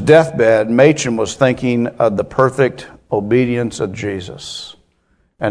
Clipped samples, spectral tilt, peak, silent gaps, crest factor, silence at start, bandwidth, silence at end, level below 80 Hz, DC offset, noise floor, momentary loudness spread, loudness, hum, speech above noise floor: 0.1%; -5.5 dB/octave; 0 dBFS; none; 16 dB; 0 s; 11 kHz; 0 s; -48 dBFS; under 0.1%; -60 dBFS; 16 LU; -15 LUFS; none; 46 dB